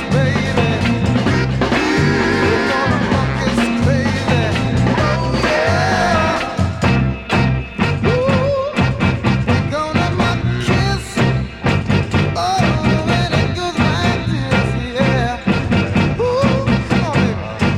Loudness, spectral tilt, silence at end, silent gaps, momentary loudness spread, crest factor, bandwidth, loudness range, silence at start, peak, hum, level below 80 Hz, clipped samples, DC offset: -16 LUFS; -6.5 dB/octave; 0 s; none; 3 LU; 14 dB; 12 kHz; 1 LU; 0 s; 0 dBFS; none; -30 dBFS; under 0.1%; under 0.1%